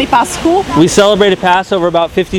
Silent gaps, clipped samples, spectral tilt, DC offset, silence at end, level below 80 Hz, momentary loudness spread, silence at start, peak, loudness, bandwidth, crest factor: none; 0.4%; -4.5 dB/octave; under 0.1%; 0 s; -34 dBFS; 5 LU; 0 s; 0 dBFS; -10 LUFS; 17.5 kHz; 10 dB